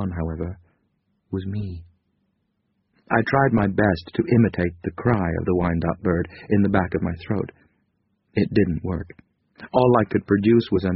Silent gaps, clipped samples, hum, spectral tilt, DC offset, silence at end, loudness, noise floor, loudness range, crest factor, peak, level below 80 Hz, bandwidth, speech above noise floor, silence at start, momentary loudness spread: none; under 0.1%; none; -7 dB/octave; under 0.1%; 0 s; -22 LUFS; -71 dBFS; 5 LU; 20 dB; -2 dBFS; -44 dBFS; 5.6 kHz; 50 dB; 0 s; 13 LU